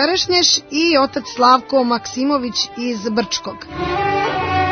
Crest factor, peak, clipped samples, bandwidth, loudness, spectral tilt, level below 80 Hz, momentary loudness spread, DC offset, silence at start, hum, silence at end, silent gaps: 16 dB; 0 dBFS; under 0.1%; 6.6 kHz; -16 LUFS; -3 dB/octave; -46 dBFS; 9 LU; under 0.1%; 0 s; none; 0 s; none